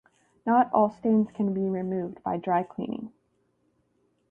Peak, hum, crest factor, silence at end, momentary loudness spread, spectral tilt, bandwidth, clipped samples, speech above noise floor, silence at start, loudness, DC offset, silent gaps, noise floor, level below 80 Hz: -10 dBFS; 60 Hz at -55 dBFS; 18 dB; 1.2 s; 12 LU; -10 dB/octave; 3.4 kHz; under 0.1%; 45 dB; 0.45 s; -27 LUFS; under 0.1%; none; -71 dBFS; -68 dBFS